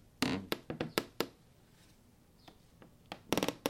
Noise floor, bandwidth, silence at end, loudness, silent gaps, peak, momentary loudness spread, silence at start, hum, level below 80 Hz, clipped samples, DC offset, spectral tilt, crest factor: -64 dBFS; 16.5 kHz; 0 s; -38 LUFS; none; -8 dBFS; 25 LU; 0.2 s; none; -66 dBFS; under 0.1%; under 0.1%; -4 dB/octave; 32 dB